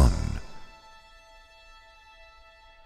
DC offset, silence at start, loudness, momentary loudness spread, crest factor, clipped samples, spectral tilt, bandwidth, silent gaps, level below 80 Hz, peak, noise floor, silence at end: under 0.1%; 0 s; -29 LUFS; 20 LU; 24 dB; under 0.1%; -6.5 dB/octave; 12 kHz; none; -32 dBFS; -6 dBFS; -53 dBFS; 2.2 s